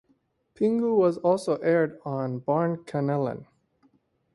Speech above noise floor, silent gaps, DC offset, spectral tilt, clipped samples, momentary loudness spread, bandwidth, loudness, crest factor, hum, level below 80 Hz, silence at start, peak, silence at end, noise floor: 44 dB; none; under 0.1%; -8 dB/octave; under 0.1%; 8 LU; 11.5 kHz; -26 LUFS; 16 dB; none; -68 dBFS; 0.6 s; -10 dBFS; 0.9 s; -69 dBFS